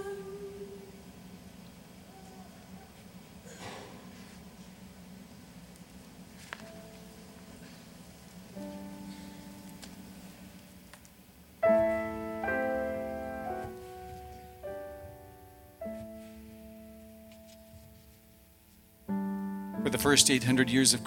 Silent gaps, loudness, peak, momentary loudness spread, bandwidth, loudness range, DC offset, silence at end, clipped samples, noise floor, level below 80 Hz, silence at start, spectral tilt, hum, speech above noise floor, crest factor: none; -31 LUFS; -6 dBFS; 25 LU; 17.5 kHz; 16 LU; under 0.1%; 0 s; under 0.1%; -59 dBFS; -60 dBFS; 0 s; -3 dB/octave; none; 34 dB; 30 dB